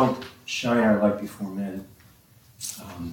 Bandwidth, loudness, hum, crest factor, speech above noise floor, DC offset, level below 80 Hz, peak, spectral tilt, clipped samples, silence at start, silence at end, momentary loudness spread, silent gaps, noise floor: 18.5 kHz; -26 LUFS; none; 18 dB; 30 dB; under 0.1%; -58 dBFS; -8 dBFS; -5 dB/octave; under 0.1%; 0 s; 0 s; 15 LU; none; -55 dBFS